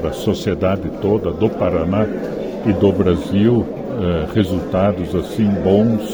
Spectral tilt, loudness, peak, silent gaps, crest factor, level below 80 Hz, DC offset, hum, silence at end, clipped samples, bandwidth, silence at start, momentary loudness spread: -8 dB/octave; -18 LUFS; -2 dBFS; none; 16 dB; -38 dBFS; under 0.1%; none; 0 s; under 0.1%; over 20 kHz; 0 s; 7 LU